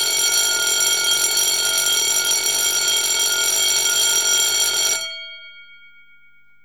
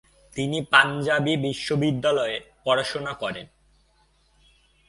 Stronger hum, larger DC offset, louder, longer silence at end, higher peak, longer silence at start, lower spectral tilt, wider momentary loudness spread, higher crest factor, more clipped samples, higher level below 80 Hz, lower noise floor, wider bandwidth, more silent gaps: first, 50 Hz at -65 dBFS vs none; first, 0.4% vs under 0.1%; first, -15 LUFS vs -23 LUFS; second, 1 s vs 1.45 s; about the same, -4 dBFS vs -2 dBFS; second, 0 s vs 0.35 s; second, 2.5 dB/octave vs -5 dB/octave; second, 3 LU vs 13 LU; second, 14 dB vs 24 dB; neither; second, -70 dBFS vs -58 dBFS; second, -55 dBFS vs -63 dBFS; first, over 20 kHz vs 11.5 kHz; neither